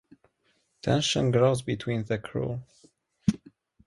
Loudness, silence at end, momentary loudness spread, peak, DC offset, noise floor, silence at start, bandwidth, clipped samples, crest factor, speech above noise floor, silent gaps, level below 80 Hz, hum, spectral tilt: -27 LUFS; 0.5 s; 11 LU; -8 dBFS; under 0.1%; -71 dBFS; 0.85 s; 11.5 kHz; under 0.1%; 20 dB; 45 dB; none; -56 dBFS; none; -5.5 dB/octave